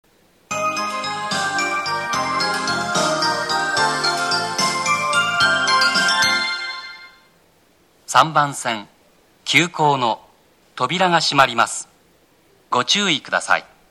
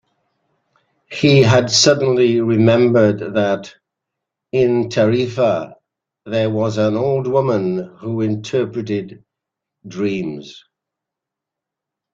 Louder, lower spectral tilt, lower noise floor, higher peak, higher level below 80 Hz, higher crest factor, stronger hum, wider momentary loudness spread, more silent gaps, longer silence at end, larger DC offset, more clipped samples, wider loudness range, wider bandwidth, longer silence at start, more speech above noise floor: about the same, -18 LUFS vs -16 LUFS; second, -2 dB/octave vs -5.5 dB/octave; second, -56 dBFS vs -84 dBFS; about the same, -2 dBFS vs -2 dBFS; about the same, -60 dBFS vs -56 dBFS; about the same, 18 dB vs 16 dB; neither; second, 10 LU vs 13 LU; neither; second, 0.3 s vs 1.55 s; neither; neither; second, 3 LU vs 10 LU; first, 16 kHz vs 9.4 kHz; second, 0.5 s vs 1.1 s; second, 39 dB vs 68 dB